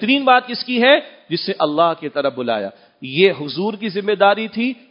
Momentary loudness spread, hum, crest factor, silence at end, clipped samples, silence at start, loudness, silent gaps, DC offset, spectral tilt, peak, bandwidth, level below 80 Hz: 11 LU; none; 18 dB; 0.15 s; under 0.1%; 0 s; -17 LUFS; none; under 0.1%; -8 dB/octave; 0 dBFS; 5.4 kHz; -70 dBFS